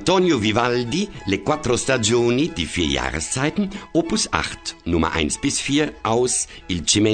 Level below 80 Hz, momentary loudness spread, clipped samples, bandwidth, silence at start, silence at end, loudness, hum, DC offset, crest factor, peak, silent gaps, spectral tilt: -40 dBFS; 6 LU; under 0.1%; 9.4 kHz; 0 s; 0 s; -21 LUFS; none; under 0.1%; 20 dB; -2 dBFS; none; -3.5 dB/octave